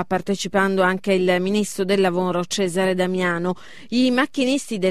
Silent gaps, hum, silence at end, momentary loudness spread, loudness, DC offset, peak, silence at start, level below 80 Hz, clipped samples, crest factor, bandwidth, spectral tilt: none; none; 0 s; 5 LU; -21 LUFS; 0.9%; -6 dBFS; 0 s; -58 dBFS; under 0.1%; 16 dB; 14 kHz; -5 dB/octave